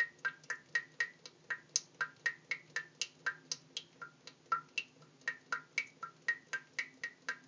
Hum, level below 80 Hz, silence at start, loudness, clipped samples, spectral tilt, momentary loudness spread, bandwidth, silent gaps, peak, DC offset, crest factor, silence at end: none; under -90 dBFS; 0 s; -40 LUFS; under 0.1%; 0.5 dB/octave; 9 LU; 7.6 kHz; none; -14 dBFS; under 0.1%; 28 dB; 0.05 s